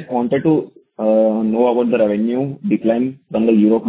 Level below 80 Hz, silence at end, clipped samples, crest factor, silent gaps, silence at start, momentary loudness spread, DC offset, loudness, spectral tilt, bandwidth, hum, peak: -56 dBFS; 0 s; under 0.1%; 14 dB; none; 0 s; 6 LU; under 0.1%; -17 LUFS; -12 dB/octave; 4 kHz; none; -2 dBFS